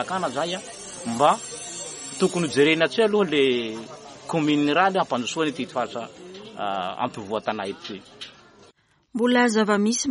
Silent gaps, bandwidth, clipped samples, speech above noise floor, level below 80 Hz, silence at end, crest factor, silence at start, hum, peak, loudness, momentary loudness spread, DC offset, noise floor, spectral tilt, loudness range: none; 11.5 kHz; under 0.1%; 35 dB; -66 dBFS; 0 s; 18 dB; 0 s; none; -6 dBFS; -23 LUFS; 18 LU; under 0.1%; -58 dBFS; -4 dB/octave; 9 LU